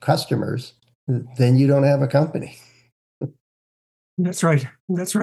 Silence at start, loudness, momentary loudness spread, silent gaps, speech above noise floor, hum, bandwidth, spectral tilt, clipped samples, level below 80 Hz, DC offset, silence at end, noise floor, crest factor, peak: 0 s; -20 LUFS; 18 LU; 0.95-1.07 s, 2.92-3.21 s, 3.41-4.17 s, 4.80-4.88 s; over 71 dB; none; 12.5 kHz; -6.5 dB/octave; under 0.1%; -66 dBFS; under 0.1%; 0 s; under -90 dBFS; 18 dB; -4 dBFS